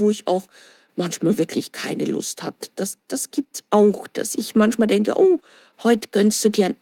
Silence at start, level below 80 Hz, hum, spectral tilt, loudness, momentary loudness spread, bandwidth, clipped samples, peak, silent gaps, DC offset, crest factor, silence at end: 0 s; -66 dBFS; none; -4.5 dB/octave; -21 LUFS; 11 LU; 17.5 kHz; under 0.1%; -4 dBFS; none; under 0.1%; 16 dB; 0.1 s